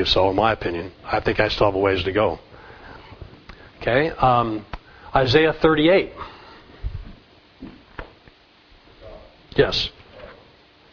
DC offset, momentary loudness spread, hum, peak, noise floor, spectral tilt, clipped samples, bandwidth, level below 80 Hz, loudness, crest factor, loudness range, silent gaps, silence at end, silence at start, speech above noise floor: under 0.1%; 25 LU; none; -2 dBFS; -52 dBFS; -6.5 dB/octave; under 0.1%; 5.4 kHz; -40 dBFS; -20 LUFS; 22 dB; 9 LU; none; 0.6 s; 0 s; 33 dB